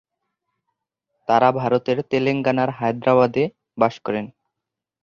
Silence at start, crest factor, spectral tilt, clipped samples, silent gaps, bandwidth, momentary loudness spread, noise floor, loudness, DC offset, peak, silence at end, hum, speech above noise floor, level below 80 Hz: 1.3 s; 20 dB; -7.5 dB/octave; under 0.1%; none; 7.2 kHz; 10 LU; -84 dBFS; -20 LUFS; under 0.1%; -2 dBFS; 0.75 s; none; 65 dB; -62 dBFS